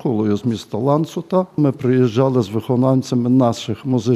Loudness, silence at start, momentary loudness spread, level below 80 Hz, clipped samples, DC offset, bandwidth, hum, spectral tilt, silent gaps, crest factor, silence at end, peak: -18 LUFS; 0 s; 5 LU; -60 dBFS; under 0.1%; under 0.1%; 13.5 kHz; none; -8 dB/octave; none; 14 dB; 0 s; -2 dBFS